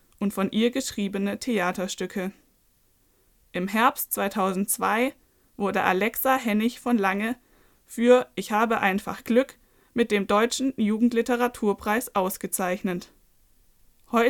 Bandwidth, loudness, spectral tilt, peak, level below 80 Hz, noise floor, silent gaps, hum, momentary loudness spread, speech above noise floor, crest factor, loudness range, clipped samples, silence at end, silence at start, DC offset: 19 kHz; -25 LUFS; -4.5 dB/octave; -4 dBFS; -60 dBFS; -64 dBFS; none; none; 9 LU; 40 dB; 22 dB; 4 LU; under 0.1%; 0 s; 0.2 s; under 0.1%